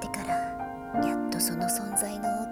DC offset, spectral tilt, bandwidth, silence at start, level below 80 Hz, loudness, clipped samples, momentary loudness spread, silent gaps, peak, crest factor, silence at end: under 0.1%; -3.5 dB/octave; 18 kHz; 0 s; -54 dBFS; -29 LUFS; under 0.1%; 6 LU; none; -12 dBFS; 18 dB; 0 s